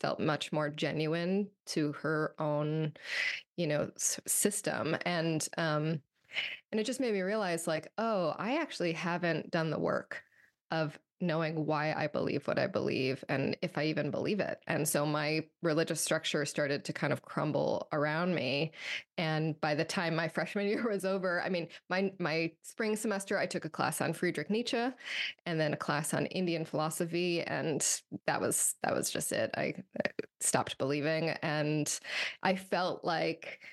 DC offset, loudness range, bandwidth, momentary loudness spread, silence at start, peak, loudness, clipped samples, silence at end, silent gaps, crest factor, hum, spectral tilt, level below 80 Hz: under 0.1%; 2 LU; 13 kHz; 5 LU; 0.05 s; -12 dBFS; -33 LUFS; under 0.1%; 0 s; 1.60-1.64 s, 3.48-3.56 s, 10.61-10.65 s; 20 dB; none; -4 dB/octave; -78 dBFS